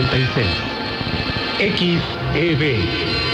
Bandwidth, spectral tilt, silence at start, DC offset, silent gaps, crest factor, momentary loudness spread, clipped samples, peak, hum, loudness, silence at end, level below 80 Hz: 9.6 kHz; -6.5 dB/octave; 0 s; under 0.1%; none; 14 dB; 5 LU; under 0.1%; -6 dBFS; none; -19 LUFS; 0 s; -36 dBFS